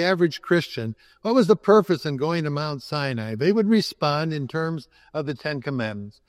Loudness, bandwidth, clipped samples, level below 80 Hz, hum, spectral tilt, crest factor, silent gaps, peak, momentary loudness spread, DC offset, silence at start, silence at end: -23 LUFS; 14.5 kHz; under 0.1%; -64 dBFS; none; -6.5 dB/octave; 20 dB; none; -4 dBFS; 13 LU; under 0.1%; 0 s; 0.2 s